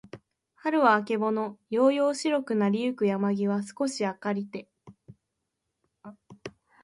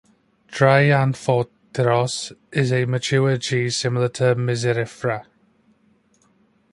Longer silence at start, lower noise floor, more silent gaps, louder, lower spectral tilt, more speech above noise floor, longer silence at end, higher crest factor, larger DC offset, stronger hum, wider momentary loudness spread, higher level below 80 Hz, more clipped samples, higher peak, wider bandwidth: second, 0.15 s vs 0.5 s; first, -82 dBFS vs -60 dBFS; neither; second, -27 LUFS vs -20 LUFS; about the same, -5.5 dB/octave vs -5.5 dB/octave; first, 56 dB vs 41 dB; second, 0.35 s vs 1.5 s; about the same, 20 dB vs 20 dB; neither; neither; first, 18 LU vs 10 LU; second, -74 dBFS vs -58 dBFS; neither; second, -8 dBFS vs -2 dBFS; about the same, 11.5 kHz vs 11.5 kHz